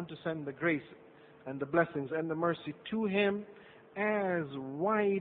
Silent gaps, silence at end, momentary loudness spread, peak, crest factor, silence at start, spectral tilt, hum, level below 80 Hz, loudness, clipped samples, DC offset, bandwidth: none; 0 s; 13 LU; -14 dBFS; 20 dB; 0 s; -10 dB/octave; none; -72 dBFS; -34 LUFS; under 0.1%; under 0.1%; 4.4 kHz